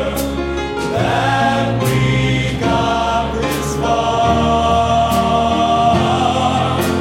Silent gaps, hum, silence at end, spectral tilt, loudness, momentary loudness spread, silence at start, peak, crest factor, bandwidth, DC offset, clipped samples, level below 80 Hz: none; none; 0 s; -5.5 dB/octave; -15 LUFS; 5 LU; 0 s; -2 dBFS; 14 dB; 16.5 kHz; under 0.1%; under 0.1%; -30 dBFS